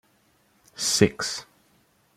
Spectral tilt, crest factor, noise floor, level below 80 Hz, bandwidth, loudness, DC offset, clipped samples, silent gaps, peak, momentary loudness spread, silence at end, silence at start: -3.5 dB/octave; 26 dB; -64 dBFS; -58 dBFS; 15.5 kHz; -24 LUFS; under 0.1%; under 0.1%; none; -4 dBFS; 16 LU; 0.75 s; 0.75 s